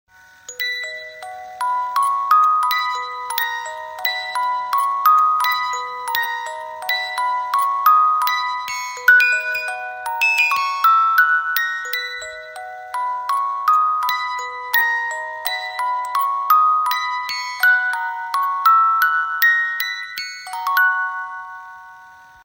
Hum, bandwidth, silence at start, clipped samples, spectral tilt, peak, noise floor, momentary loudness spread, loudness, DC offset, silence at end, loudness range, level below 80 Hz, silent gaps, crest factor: none; 16.5 kHz; 0.5 s; under 0.1%; 2.5 dB/octave; 0 dBFS; -44 dBFS; 14 LU; -18 LUFS; under 0.1%; 0.2 s; 4 LU; -70 dBFS; none; 18 dB